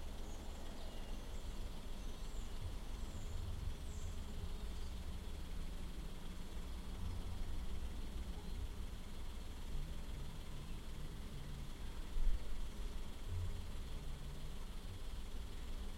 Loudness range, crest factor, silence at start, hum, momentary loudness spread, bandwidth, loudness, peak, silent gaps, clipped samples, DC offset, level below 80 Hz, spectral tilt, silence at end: 2 LU; 20 dB; 0 s; none; 4 LU; 15.5 kHz; -50 LUFS; -24 dBFS; none; under 0.1%; under 0.1%; -44 dBFS; -5 dB/octave; 0 s